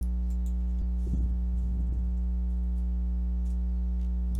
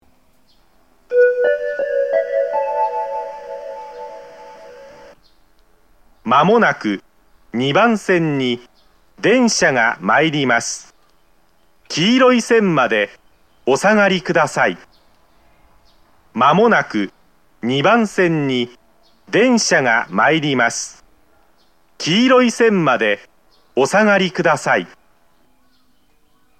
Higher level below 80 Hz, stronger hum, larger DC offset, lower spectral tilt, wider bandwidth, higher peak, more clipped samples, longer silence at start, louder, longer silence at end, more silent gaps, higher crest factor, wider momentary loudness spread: first, -28 dBFS vs -60 dBFS; first, 60 Hz at -30 dBFS vs none; second, under 0.1% vs 0.2%; first, -9.5 dB/octave vs -4.5 dB/octave; second, 1.4 kHz vs 14 kHz; second, -20 dBFS vs 0 dBFS; neither; second, 0 s vs 1.1 s; second, -32 LUFS vs -16 LUFS; second, 0 s vs 1.75 s; neither; second, 8 dB vs 18 dB; second, 1 LU vs 15 LU